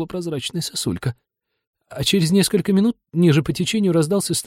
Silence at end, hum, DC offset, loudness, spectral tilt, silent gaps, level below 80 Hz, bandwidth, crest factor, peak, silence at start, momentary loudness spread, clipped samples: 0 s; none; under 0.1%; -20 LUFS; -5 dB/octave; 1.67-1.73 s; -50 dBFS; 16.5 kHz; 16 dB; -4 dBFS; 0 s; 9 LU; under 0.1%